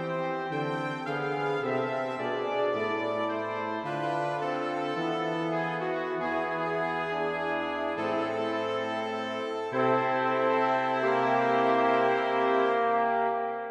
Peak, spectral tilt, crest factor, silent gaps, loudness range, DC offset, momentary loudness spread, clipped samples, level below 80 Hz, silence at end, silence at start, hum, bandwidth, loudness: -12 dBFS; -6 dB/octave; 16 dB; none; 5 LU; under 0.1%; 6 LU; under 0.1%; -74 dBFS; 0 s; 0 s; none; 10 kHz; -29 LUFS